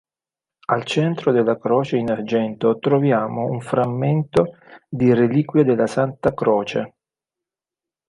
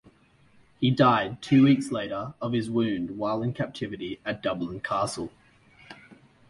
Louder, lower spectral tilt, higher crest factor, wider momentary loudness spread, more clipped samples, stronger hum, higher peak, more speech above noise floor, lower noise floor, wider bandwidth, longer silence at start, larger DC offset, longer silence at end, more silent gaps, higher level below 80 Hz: first, -20 LUFS vs -26 LUFS; about the same, -7.5 dB/octave vs -6.5 dB/octave; about the same, 16 dB vs 20 dB; second, 7 LU vs 13 LU; neither; neither; first, -2 dBFS vs -8 dBFS; first, over 71 dB vs 34 dB; first, under -90 dBFS vs -59 dBFS; about the same, 11 kHz vs 11.5 kHz; about the same, 0.7 s vs 0.8 s; neither; first, 1.2 s vs 0.35 s; neither; about the same, -56 dBFS vs -60 dBFS